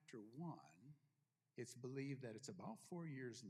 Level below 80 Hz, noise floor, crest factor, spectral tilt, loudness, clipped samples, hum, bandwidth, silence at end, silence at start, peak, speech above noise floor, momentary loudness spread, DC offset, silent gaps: under -90 dBFS; -88 dBFS; 16 dB; -5.5 dB/octave; -54 LUFS; under 0.1%; none; 14.5 kHz; 0 s; 0 s; -38 dBFS; 35 dB; 14 LU; under 0.1%; none